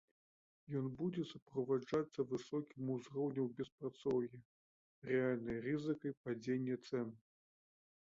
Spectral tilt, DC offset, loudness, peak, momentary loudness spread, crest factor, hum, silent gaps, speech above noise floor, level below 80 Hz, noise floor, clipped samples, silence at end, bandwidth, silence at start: -7 dB/octave; under 0.1%; -42 LUFS; -24 dBFS; 7 LU; 18 dB; none; 1.42-1.46 s, 3.72-3.78 s, 4.45-5.02 s, 6.17-6.24 s; over 49 dB; -76 dBFS; under -90 dBFS; under 0.1%; 0.85 s; 7.6 kHz; 0.7 s